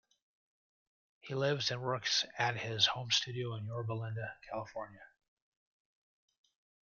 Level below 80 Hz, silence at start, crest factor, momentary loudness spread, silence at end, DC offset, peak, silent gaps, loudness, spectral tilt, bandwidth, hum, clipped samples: -74 dBFS; 1.25 s; 24 dB; 13 LU; 1.8 s; under 0.1%; -14 dBFS; none; -35 LUFS; -3 dB/octave; 7.4 kHz; none; under 0.1%